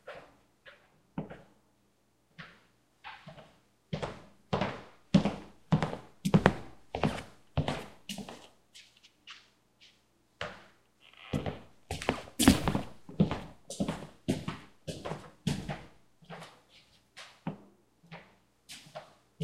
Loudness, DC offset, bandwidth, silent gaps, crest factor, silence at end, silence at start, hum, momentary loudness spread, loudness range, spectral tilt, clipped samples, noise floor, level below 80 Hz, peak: -34 LUFS; under 0.1%; 16 kHz; none; 34 dB; 0 s; 0.05 s; none; 23 LU; 17 LU; -5.5 dB/octave; under 0.1%; -72 dBFS; -52 dBFS; -2 dBFS